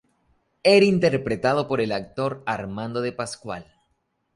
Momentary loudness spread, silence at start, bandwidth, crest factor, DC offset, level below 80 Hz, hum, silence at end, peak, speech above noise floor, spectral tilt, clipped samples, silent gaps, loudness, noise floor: 15 LU; 0.65 s; 11.5 kHz; 18 dB; under 0.1%; -56 dBFS; none; 0.75 s; -6 dBFS; 50 dB; -5.5 dB/octave; under 0.1%; none; -23 LUFS; -72 dBFS